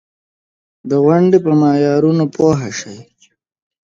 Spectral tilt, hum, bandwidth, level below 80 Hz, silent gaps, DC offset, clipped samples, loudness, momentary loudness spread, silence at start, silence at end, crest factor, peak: -7.5 dB/octave; none; 7.6 kHz; -52 dBFS; none; under 0.1%; under 0.1%; -13 LUFS; 14 LU; 0.85 s; 0.85 s; 14 dB; 0 dBFS